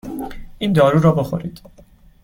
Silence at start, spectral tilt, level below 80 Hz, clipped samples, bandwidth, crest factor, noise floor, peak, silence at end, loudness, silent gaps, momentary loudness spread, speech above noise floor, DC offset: 0.05 s; -8 dB/octave; -42 dBFS; under 0.1%; 16.5 kHz; 16 dB; -48 dBFS; -2 dBFS; 0.65 s; -17 LUFS; none; 19 LU; 32 dB; under 0.1%